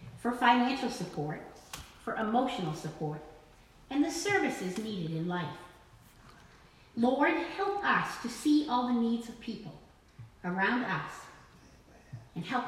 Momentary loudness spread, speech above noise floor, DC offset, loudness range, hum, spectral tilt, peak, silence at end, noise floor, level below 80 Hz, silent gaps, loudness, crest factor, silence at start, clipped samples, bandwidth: 17 LU; 27 dB; under 0.1%; 5 LU; none; -5 dB/octave; -10 dBFS; 0 s; -58 dBFS; -62 dBFS; none; -32 LUFS; 22 dB; 0 s; under 0.1%; 15.5 kHz